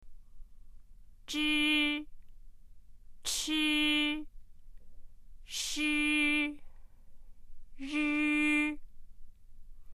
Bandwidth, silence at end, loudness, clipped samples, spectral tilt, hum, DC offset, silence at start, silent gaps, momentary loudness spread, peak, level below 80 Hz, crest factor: 14.5 kHz; 0 s; -30 LUFS; under 0.1%; -1 dB/octave; none; under 0.1%; 0 s; none; 14 LU; -16 dBFS; -52 dBFS; 18 dB